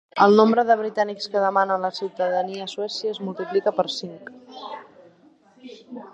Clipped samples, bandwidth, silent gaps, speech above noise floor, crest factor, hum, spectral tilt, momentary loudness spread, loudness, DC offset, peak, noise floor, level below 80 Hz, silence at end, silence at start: under 0.1%; 8.2 kHz; none; 33 dB; 22 dB; none; -5.5 dB/octave; 23 LU; -22 LUFS; under 0.1%; -2 dBFS; -55 dBFS; -78 dBFS; 0.05 s; 0.15 s